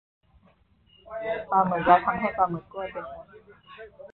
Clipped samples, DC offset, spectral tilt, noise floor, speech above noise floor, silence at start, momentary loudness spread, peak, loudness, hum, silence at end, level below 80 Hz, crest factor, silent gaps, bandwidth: under 0.1%; under 0.1%; -10 dB/octave; -62 dBFS; 36 dB; 1.05 s; 25 LU; -4 dBFS; -25 LUFS; none; 0.05 s; -58 dBFS; 24 dB; none; 4.3 kHz